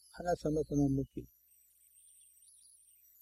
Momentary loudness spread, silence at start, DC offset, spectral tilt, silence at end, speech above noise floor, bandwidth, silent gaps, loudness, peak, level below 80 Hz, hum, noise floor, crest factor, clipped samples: 23 LU; 0.15 s; under 0.1%; -7.5 dB/octave; 1.95 s; 33 dB; 15 kHz; none; -35 LUFS; -22 dBFS; -56 dBFS; 60 Hz at -65 dBFS; -68 dBFS; 18 dB; under 0.1%